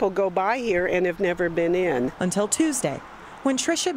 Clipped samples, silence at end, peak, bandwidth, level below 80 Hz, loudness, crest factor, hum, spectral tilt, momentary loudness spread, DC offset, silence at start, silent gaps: under 0.1%; 0 s; -8 dBFS; 16 kHz; -52 dBFS; -23 LUFS; 16 dB; none; -4 dB/octave; 6 LU; under 0.1%; 0 s; none